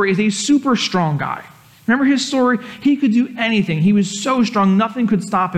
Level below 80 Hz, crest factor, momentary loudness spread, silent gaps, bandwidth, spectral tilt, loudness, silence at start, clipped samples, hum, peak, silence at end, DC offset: -58 dBFS; 12 dB; 4 LU; none; 12.5 kHz; -5 dB/octave; -16 LUFS; 0 s; under 0.1%; none; -6 dBFS; 0 s; under 0.1%